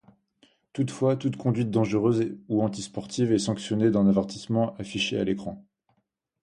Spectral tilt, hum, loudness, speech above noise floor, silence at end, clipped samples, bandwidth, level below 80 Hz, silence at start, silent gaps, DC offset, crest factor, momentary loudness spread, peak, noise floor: -6.5 dB/octave; none; -26 LUFS; 49 dB; 0.8 s; under 0.1%; 11 kHz; -58 dBFS; 0.75 s; none; under 0.1%; 16 dB; 10 LU; -10 dBFS; -74 dBFS